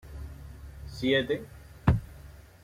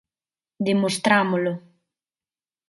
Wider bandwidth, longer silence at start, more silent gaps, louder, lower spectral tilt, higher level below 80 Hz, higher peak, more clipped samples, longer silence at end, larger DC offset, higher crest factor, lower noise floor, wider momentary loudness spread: first, 16 kHz vs 11.5 kHz; second, 0.05 s vs 0.6 s; neither; second, -29 LUFS vs -22 LUFS; first, -7 dB/octave vs -5 dB/octave; first, -42 dBFS vs -70 dBFS; second, -8 dBFS vs -4 dBFS; neither; second, 0.2 s vs 1.1 s; neither; about the same, 22 dB vs 22 dB; second, -49 dBFS vs under -90 dBFS; first, 22 LU vs 9 LU